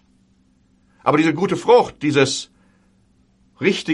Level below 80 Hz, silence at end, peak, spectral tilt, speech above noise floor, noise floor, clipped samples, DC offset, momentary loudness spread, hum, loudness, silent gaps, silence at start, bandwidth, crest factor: -58 dBFS; 0 s; -2 dBFS; -5 dB/octave; 41 dB; -58 dBFS; under 0.1%; under 0.1%; 9 LU; none; -18 LUFS; none; 1.05 s; 11.5 kHz; 18 dB